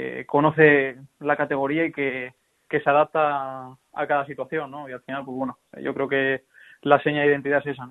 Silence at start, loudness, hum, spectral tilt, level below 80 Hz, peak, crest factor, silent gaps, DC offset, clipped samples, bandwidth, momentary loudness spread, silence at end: 0 s; -23 LUFS; none; -8 dB/octave; -66 dBFS; -2 dBFS; 22 dB; none; under 0.1%; under 0.1%; 4.1 kHz; 15 LU; 0 s